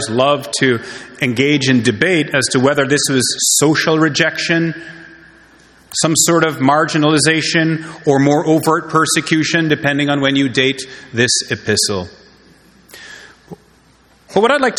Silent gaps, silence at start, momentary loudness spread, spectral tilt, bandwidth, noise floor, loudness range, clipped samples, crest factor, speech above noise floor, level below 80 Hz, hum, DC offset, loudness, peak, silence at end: none; 0 s; 9 LU; -3.5 dB/octave; 18 kHz; -50 dBFS; 5 LU; under 0.1%; 16 dB; 36 dB; -54 dBFS; none; under 0.1%; -14 LUFS; 0 dBFS; 0 s